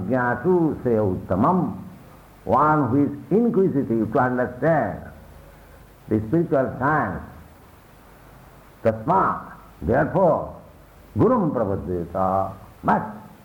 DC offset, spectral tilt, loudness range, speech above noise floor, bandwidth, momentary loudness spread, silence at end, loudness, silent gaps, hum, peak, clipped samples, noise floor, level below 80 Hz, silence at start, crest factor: under 0.1%; -10 dB/octave; 5 LU; 28 dB; 19.5 kHz; 13 LU; 0.15 s; -22 LUFS; none; none; -8 dBFS; under 0.1%; -48 dBFS; -48 dBFS; 0 s; 14 dB